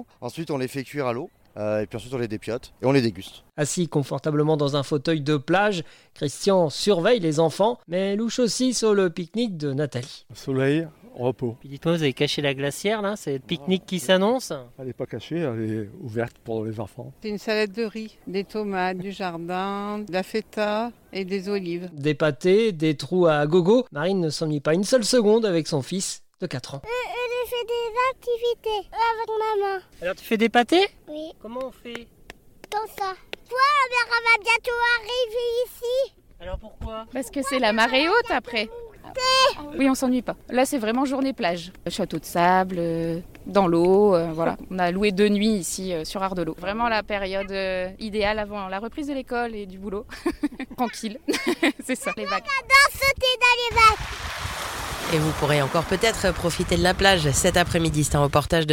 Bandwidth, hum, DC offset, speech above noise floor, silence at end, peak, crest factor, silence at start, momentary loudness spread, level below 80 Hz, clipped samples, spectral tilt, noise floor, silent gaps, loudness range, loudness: 17 kHz; none; under 0.1%; 23 dB; 0 s; -4 dBFS; 20 dB; 0 s; 13 LU; -46 dBFS; under 0.1%; -4.5 dB/octave; -47 dBFS; none; 7 LU; -23 LUFS